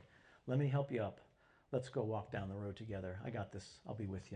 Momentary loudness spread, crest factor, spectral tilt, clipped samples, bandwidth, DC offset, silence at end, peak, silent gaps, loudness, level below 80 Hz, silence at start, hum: 13 LU; 18 dB; -8 dB/octave; under 0.1%; 9.8 kHz; under 0.1%; 0 s; -24 dBFS; none; -43 LUFS; -64 dBFS; 0 s; none